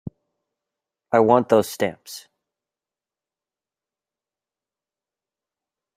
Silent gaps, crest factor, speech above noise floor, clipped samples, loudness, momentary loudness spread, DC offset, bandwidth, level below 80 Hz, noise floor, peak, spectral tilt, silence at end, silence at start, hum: none; 24 dB; over 71 dB; under 0.1%; -19 LUFS; 22 LU; under 0.1%; 16 kHz; -66 dBFS; under -90 dBFS; -2 dBFS; -5.5 dB/octave; 3.75 s; 0.05 s; none